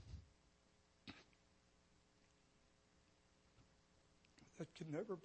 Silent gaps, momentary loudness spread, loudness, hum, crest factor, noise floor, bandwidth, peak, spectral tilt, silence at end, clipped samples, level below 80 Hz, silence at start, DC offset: none; 16 LU; -54 LUFS; none; 24 dB; -76 dBFS; 8.4 kHz; -34 dBFS; -6.5 dB/octave; 0 s; under 0.1%; -72 dBFS; 0 s; under 0.1%